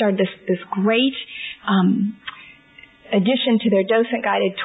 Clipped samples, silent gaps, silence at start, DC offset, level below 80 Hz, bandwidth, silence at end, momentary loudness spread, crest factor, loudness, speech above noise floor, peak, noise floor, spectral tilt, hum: under 0.1%; none; 0 s; under 0.1%; -66 dBFS; 4 kHz; 0 s; 11 LU; 14 dB; -20 LUFS; 29 dB; -6 dBFS; -48 dBFS; -10 dB/octave; none